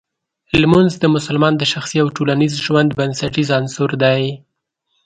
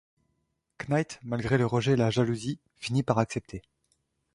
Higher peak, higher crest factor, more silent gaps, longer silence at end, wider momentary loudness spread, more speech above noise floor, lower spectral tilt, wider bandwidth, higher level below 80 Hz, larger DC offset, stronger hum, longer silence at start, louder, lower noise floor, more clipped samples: first, 0 dBFS vs -8 dBFS; second, 16 dB vs 22 dB; neither; about the same, 0.7 s vs 0.75 s; second, 7 LU vs 12 LU; first, 55 dB vs 49 dB; about the same, -5.5 dB/octave vs -6.5 dB/octave; second, 9.4 kHz vs 11.5 kHz; first, -46 dBFS vs -56 dBFS; neither; neither; second, 0.55 s vs 0.8 s; first, -16 LUFS vs -28 LUFS; second, -70 dBFS vs -77 dBFS; neither